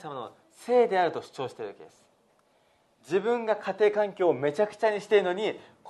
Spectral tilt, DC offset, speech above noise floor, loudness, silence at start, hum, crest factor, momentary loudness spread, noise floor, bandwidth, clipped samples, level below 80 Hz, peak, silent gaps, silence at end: -5.5 dB/octave; under 0.1%; 39 dB; -27 LUFS; 0.05 s; none; 18 dB; 16 LU; -66 dBFS; 12 kHz; under 0.1%; -80 dBFS; -10 dBFS; none; 0 s